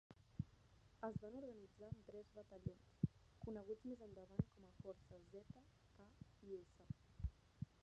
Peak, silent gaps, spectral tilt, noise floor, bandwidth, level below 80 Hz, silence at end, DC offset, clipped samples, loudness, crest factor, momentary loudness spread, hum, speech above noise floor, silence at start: -26 dBFS; none; -9 dB/octave; -71 dBFS; 8.8 kHz; -64 dBFS; 0.1 s; under 0.1%; under 0.1%; -54 LUFS; 26 dB; 14 LU; none; 17 dB; 0.1 s